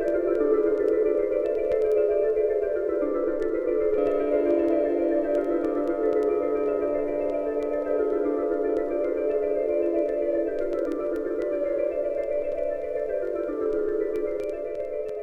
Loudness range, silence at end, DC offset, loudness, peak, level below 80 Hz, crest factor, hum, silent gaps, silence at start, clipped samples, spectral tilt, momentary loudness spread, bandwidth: 3 LU; 0 s; under 0.1%; -26 LUFS; -12 dBFS; -50 dBFS; 14 dB; none; none; 0 s; under 0.1%; -7.5 dB/octave; 6 LU; 5.4 kHz